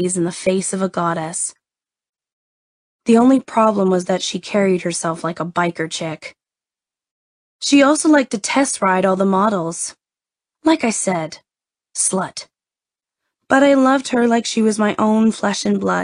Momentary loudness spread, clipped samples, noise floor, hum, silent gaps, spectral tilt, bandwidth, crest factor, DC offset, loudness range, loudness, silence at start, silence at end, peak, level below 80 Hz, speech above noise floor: 12 LU; under 0.1%; under -90 dBFS; none; 2.33-2.99 s, 7.11-7.59 s; -4.5 dB/octave; 10.5 kHz; 18 dB; under 0.1%; 5 LU; -17 LUFS; 0 s; 0 s; -2 dBFS; -62 dBFS; over 73 dB